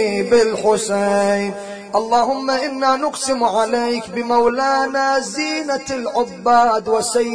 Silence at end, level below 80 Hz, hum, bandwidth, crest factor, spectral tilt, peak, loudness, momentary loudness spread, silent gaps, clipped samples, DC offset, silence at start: 0 s; -54 dBFS; none; 11 kHz; 16 dB; -3.5 dB/octave; -2 dBFS; -17 LUFS; 7 LU; none; under 0.1%; 0.2%; 0 s